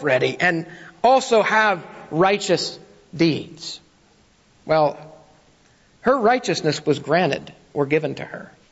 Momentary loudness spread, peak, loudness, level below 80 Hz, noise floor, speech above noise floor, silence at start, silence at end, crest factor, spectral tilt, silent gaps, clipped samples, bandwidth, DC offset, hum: 18 LU; -6 dBFS; -20 LUFS; -60 dBFS; -56 dBFS; 36 dB; 0 s; 0.25 s; 16 dB; -4.5 dB/octave; none; under 0.1%; 8 kHz; under 0.1%; none